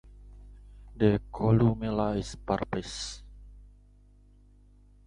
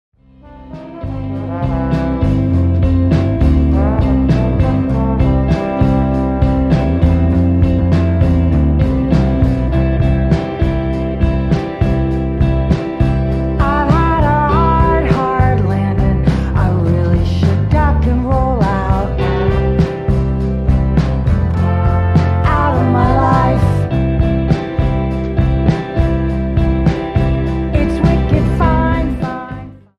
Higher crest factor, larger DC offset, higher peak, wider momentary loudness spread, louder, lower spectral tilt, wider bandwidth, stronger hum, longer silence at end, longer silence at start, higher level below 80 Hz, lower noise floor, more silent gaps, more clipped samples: first, 22 dB vs 12 dB; neither; second, -10 dBFS vs 0 dBFS; first, 13 LU vs 4 LU; second, -29 LUFS vs -14 LUFS; second, -7 dB/octave vs -9 dB/octave; first, 10.5 kHz vs 7.2 kHz; first, 50 Hz at -45 dBFS vs none; first, 1.4 s vs 0.2 s; second, 0.05 s vs 0.5 s; second, -48 dBFS vs -18 dBFS; first, -57 dBFS vs -38 dBFS; neither; neither